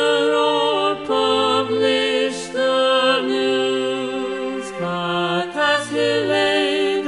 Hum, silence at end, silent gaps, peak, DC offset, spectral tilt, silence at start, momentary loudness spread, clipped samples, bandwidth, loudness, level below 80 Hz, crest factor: none; 0 s; none; -4 dBFS; under 0.1%; -4 dB/octave; 0 s; 7 LU; under 0.1%; 11.5 kHz; -19 LUFS; -62 dBFS; 14 dB